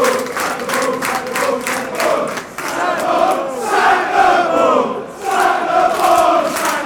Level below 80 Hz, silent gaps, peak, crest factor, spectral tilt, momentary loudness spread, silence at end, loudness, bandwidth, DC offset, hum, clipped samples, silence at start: -52 dBFS; none; -2 dBFS; 14 dB; -2.5 dB/octave; 7 LU; 0 s; -15 LUFS; over 20 kHz; under 0.1%; none; under 0.1%; 0 s